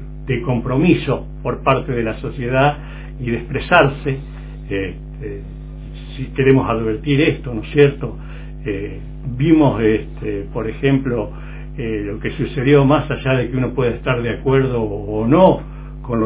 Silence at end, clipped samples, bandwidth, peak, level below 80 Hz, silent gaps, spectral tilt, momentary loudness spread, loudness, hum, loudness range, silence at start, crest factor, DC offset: 0 s; under 0.1%; 4 kHz; 0 dBFS; -32 dBFS; none; -11.5 dB/octave; 17 LU; -18 LUFS; none; 3 LU; 0 s; 18 dB; under 0.1%